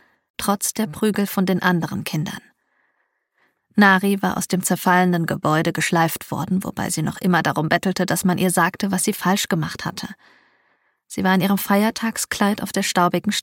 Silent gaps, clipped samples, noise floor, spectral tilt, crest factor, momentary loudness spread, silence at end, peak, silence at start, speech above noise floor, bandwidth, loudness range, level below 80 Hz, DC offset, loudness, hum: none; under 0.1%; -70 dBFS; -4.5 dB/octave; 18 dB; 9 LU; 0 s; -2 dBFS; 0.4 s; 50 dB; 17 kHz; 4 LU; -58 dBFS; under 0.1%; -20 LUFS; none